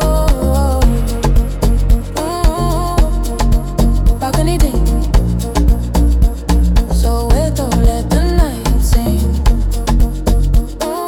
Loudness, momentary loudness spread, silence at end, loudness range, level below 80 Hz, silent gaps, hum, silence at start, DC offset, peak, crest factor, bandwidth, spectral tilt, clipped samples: -15 LUFS; 3 LU; 0 s; 1 LU; -12 dBFS; none; none; 0 s; under 0.1%; 0 dBFS; 12 dB; 16.5 kHz; -6.5 dB/octave; under 0.1%